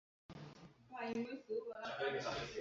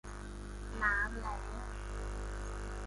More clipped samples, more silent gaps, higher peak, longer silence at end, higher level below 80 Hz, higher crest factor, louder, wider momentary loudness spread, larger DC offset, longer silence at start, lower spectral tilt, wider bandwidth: neither; neither; second, -28 dBFS vs -18 dBFS; about the same, 0 s vs 0 s; second, -72 dBFS vs -42 dBFS; about the same, 18 dB vs 22 dB; second, -44 LUFS vs -39 LUFS; about the same, 16 LU vs 14 LU; neither; first, 0.3 s vs 0.05 s; second, -3 dB/octave vs -5 dB/octave; second, 7.4 kHz vs 11.5 kHz